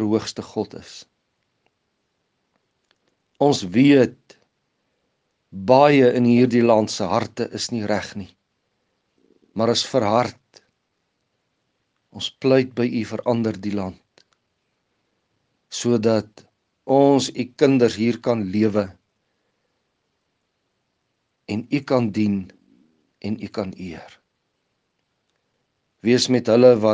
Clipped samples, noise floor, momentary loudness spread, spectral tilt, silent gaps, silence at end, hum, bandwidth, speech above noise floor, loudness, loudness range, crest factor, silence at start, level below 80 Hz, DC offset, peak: under 0.1%; -73 dBFS; 17 LU; -5.5 dB/octave; none; 0 s; none; 9.8 kHz; 54 dB; -20 LUFS; 10 LU; 22 dB; 0 s; -66 dBFS; under 0.1%; 0 dBFS